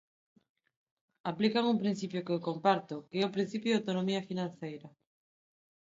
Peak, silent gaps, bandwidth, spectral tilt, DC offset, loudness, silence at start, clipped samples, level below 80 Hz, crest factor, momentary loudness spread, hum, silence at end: -12 dBFS; none; 7.8 kHz; -6 dB/octave; under 0.1%; -33 LUFS; 1.25 s; under 0.1%; -80 dBFS; 22 dB; 11 LU; none; 0.95 s